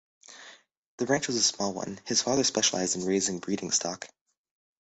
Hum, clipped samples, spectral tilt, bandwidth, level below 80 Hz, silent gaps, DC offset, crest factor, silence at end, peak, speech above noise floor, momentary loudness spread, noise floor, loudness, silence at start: none; under 0.1%; -2.5 dB/octave; 8.6 kHz; -66 dBFS; 0.77-0.98 s; under 0.1%; 20 dB; 0.8 s; -10 dBFS; 24 dB; 19 LU; -53 dBFS; -27 LUFS; 0.3 s